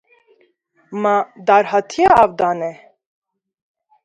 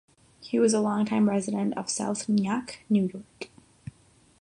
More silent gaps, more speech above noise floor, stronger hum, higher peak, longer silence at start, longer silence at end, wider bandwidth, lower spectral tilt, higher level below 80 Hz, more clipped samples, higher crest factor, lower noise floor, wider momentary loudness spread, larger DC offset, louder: neither; first, 44 dB vs 33 dB; neither; first, 0 dBFS vs -12 dBFS; first, 0.9 s vs 0.4 s; first, 1.3 s vs 0.95 s; second, 9.6 kHz vs 11 kHz; about the same, -5 dB/octave vs -5.5 dB/octave; first, -52 dBFS vs -66 dBFS; neither; about the same, 18 dB vs 16 dB; about the same, -59 dBFS vs -59 dBFS; second, 13 LU vs 23 LU; neither; first, -15 LUFS vs -26 LUFS